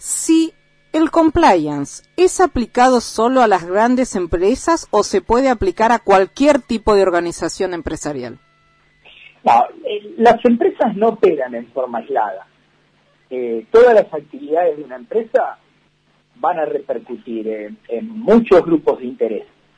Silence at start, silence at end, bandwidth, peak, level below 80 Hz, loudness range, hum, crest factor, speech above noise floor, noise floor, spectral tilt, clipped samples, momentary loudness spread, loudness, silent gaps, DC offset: 0 s; 0.35 s; 11 kHz; -2 dBFS; -40 dBFS; 6 LU; none; 14 dB; 43 dB; -58 dBFS; -4.5 dB/octave; under 0.1%; 13 LU; -16 LUFS; none; under 0.1%